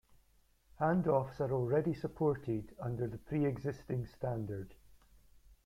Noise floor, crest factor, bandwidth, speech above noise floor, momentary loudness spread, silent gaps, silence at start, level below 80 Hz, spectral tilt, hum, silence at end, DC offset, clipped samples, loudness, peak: -70 dBFS; 18 dB; 15 kHz; 34 dB; 9 LU; none; 0.8 s; -60 dBFS; -9.5 dB/octave; none; 0.15 s; under 0.1%; under 0.1%; -36 LUFS; -18 dBFS